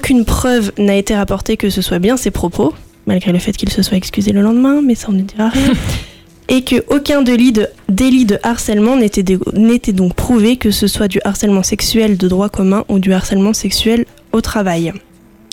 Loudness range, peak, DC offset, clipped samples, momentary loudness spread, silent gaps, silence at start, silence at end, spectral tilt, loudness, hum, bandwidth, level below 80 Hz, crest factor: 2 LU; -2 dBFS; under 0.1%; under 0.1%; 6 LU; none; 0 s; 0.55 s; -5 dB/octave; -13 LUFS; none; 17 kHz; -28 dBFS; 12 dB